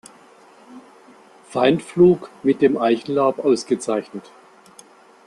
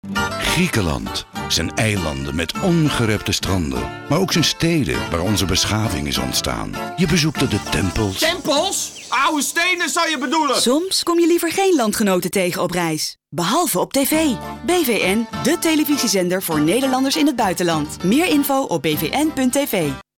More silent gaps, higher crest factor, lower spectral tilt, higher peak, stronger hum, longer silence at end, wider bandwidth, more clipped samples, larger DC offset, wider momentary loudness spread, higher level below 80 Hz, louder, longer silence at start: neither; first, 18 dB vs 12 dB; first, -6 dB/octave vs -4 dB/octave; first, -2 dBFS vs -6 dBFS; neither; first, 1.05 s vs 0.15 s; second, 11.5 kHz vs 19 kHz; neither; neither; first, 11 LU vs 5 LU; second, -60 dBFS vs -38 dBFS; about the same, -19 LUFS vs -18 LUFS; first, 0.7 s vs 0.05 s